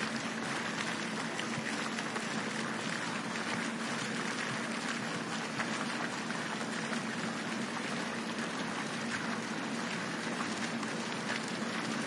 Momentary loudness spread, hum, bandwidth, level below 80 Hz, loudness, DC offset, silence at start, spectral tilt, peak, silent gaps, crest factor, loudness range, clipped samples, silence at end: 1 LU; none; 11.5 kHz; -80 dBFS; -36 LUFS; under 0.1%; 0 s; -3.5 dB/octave; -18 dBFS; none; 18 dB; 1 LU; under 0.1%; 0 s